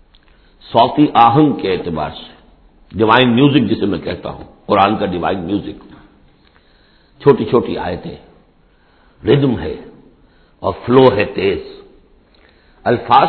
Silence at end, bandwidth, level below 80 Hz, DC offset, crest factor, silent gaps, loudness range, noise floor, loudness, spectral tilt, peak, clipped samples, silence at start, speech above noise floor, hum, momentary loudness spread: 0 s; 5.4 kHz; -44 dBFS; under 0.1%; 16 dB; none; 6 LU; -52 dBFS; -14 LUFS; -9.5 dB/octave; 0 dBFS; under 0.1%; 0.65 s; 38 dB; none; 17 LU